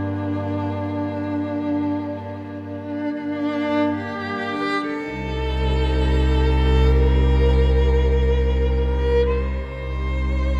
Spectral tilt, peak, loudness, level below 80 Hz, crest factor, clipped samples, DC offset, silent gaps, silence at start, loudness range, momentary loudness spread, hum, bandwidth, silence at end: -8 dB/octave; -6 dBFS; -22 LUFS; -22 dBFS; 14 dB; under 0.1%; under 0.1%; none; 0 s; 6 LU; 9 LU; none; 5.6 kHz; 0 s